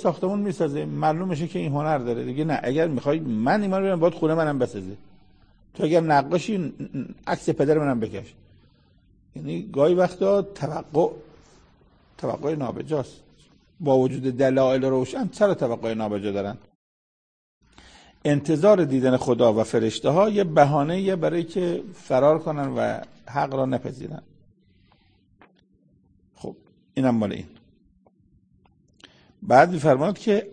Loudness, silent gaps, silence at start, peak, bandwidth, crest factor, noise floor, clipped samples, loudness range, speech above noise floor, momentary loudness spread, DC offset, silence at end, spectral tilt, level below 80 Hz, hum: -23 LUFS; 16.75-17.61 s; 0 s; -2 dBFS; 9.8 kHz; 22 dB; -61 dBFS; under 0.1%; 10 LU; 39 dB; 14 LU; under 0.1%; 0 s; -7 dB/octave; -58 dBFS; none